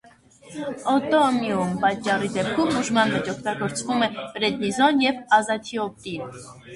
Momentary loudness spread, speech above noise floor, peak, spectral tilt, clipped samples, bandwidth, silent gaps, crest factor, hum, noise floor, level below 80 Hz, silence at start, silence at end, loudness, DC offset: 14 LU; 28 dB; -4 dBFS; -4.5 dB/octave; under 0.1%; 11.5 kHz; none; 20 dB; none; -51 dBFS; -60 dBFS; 0.45 s; 0 s; -23 LUFS; under 0.1%